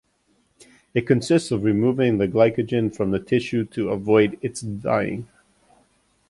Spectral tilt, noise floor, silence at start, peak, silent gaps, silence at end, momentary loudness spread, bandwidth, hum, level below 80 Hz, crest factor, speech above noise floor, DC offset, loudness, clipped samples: -6.5 dB/octave; -65 dBFS; 0.95 s; -4 dBFS; none; 1.05 s; 9 LU; 11.5 kHz; none; -54 dBFS; 18 dB; 44 dB; under 0.1%; -22 LUFS; under 0.1%